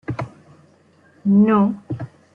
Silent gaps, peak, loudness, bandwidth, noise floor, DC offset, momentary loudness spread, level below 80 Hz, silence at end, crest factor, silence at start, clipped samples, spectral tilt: none; -6 dBFS; -18 LUFS; 3.2 kHz; -54 dBFS; under 0.1%; 17 LU; -56 dBFS; 0.3 s; 14 dB; 0.1 s; under 0.1%; -10 dB/octave